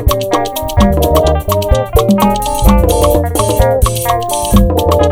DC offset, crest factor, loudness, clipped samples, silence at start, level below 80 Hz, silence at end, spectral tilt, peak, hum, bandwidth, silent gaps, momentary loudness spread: under 0.1%; 10 dB; -12 LUFS; 0.8%; 0 s; -16 dBFS; 0 s; -5.5 dB/octave; 0 dBFS; none; over 20 kHz; none; 4 LU